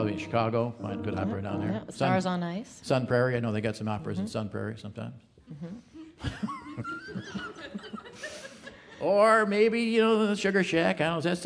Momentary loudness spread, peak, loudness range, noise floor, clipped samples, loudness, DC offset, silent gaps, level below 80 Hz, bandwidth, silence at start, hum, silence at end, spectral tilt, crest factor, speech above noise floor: 19 LU; -8 dBFS; 13 LU; -48 dBFS; under 0.1%; -28 LUFS; under 0.1%; none; -60 dBFS; 11 kHz; 0 s; none; 0 s; -6 dB/octave; 20 dB; 20 dB